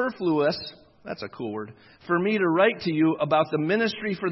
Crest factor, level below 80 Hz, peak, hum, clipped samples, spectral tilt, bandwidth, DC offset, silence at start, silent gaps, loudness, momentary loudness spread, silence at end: 18 dB; -66 dBFS; -8 dBFS; none; under 0.1%; -7.5 dB/octave; 6 kHz; under 0.1%; 0 s; none; -24 LUFS; 15 LU; 0 s